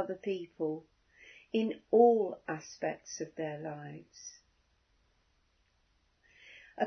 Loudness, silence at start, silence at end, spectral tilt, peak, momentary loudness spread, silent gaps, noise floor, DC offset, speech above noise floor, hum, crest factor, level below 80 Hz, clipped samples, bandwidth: -33 LUFS; 0 s; 0 s; -5 dB/octave; -12 dBFS; 24 LU; none; -73 dBFS; under 0.1%; 40 dB; none; 24 dB; -76 dBFS; under 0.1%; 6.4 kHz